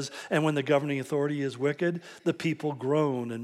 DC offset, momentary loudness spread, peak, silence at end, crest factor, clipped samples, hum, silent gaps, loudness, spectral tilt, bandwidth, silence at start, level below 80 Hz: under 0.1%; 5 LU; -12 dBFS; 0 s; 16 dB; under 0.1%; none; none; -29 LUFS; -6 dB/octave; 13.5 kHz; 0 s; -82 dBFS